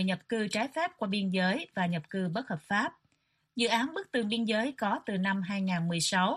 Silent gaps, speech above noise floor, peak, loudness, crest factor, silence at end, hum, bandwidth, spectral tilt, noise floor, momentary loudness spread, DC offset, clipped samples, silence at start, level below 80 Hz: none; 45 dB; -14 dBFS; -31 LUFS; 18 dB; 0 s; none; 12.5 kHz; -4.5 dB/octave; -75 dBFS; 5 LU; under 0.1%; under 0.1%; 0 s; -72 dBFS